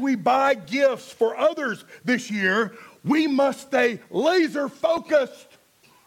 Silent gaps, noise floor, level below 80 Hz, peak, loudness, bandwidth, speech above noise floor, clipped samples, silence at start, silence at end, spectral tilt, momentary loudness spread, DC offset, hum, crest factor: none; -57 dBFS; -70 dBFS; -8 dBFS; -23 LUFS; 16.5 kHz; 35 dB; under 0.1%; 0 s; 0.7 s; -5 dB/octave; 8 LU; under 0.1%; none; 14 dB